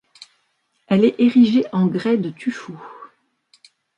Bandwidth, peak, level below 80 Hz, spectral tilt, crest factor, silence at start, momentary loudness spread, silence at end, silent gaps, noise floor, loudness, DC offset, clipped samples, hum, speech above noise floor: 8 kHz; -4 dBFS; -66 dBFS; -8 dB/octave; 16 dB; 0.9 s; 21 LU; 0.9 s; none; -68 dBFS; -18 LUFS; under 0.1%; under 0.1%; none; 51 dB